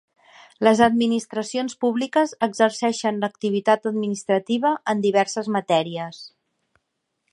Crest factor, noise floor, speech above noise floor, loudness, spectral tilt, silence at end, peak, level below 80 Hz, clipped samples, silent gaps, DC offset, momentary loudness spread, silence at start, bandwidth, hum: 20 dB; -77 dBFS; 56 dB; -22 LUFS; -4.5 dB/octave; 1.05 s; -2 dBFS; -66 dBFS; under 0.1%; none; under 0.1%; 8 LU; 0.6 s; 11.5 kHz; none